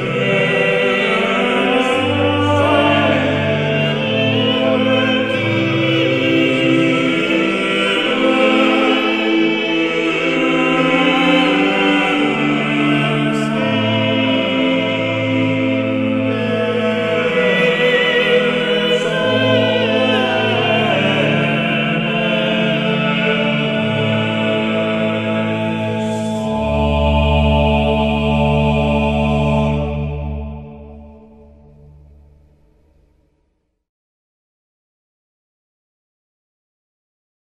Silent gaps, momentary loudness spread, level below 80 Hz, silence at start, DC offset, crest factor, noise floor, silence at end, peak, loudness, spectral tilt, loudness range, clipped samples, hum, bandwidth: none; 4 LU; -32 dBFS; 0 s; 0.2%; 16 dB; -66 dBFS; 6.25 s; -2 dBFS; -15 LUFS; -6 dB/octave; 3 LU; under 0.1%; none; 12 kHz